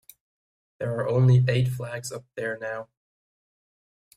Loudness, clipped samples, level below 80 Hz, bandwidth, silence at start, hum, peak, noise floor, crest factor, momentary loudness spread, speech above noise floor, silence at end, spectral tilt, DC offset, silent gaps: -25 LUFS; under 0.1%; -60 dBFS; 14.5 kHz; 0.8 s; none; -10 dBFS; under -90 dBFS; 18 dB; 15 LU; over 66 dB; 1.35 s; -7 dB/octave; under 0.1%; none